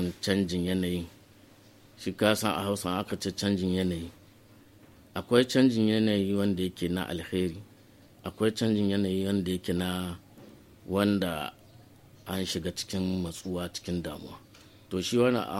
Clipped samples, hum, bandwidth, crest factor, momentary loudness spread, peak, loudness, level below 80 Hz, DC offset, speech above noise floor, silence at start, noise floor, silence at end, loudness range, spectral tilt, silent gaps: under 0.1%; none; 16 kHz; 22 dB; 14 LU; -8 dBFS; -29 LUFS; -58 dBFS; under 0.1%; 28 dB; 0 s; -56 dBFS; 0 s; 5 LU; -5.5 dB/octave; none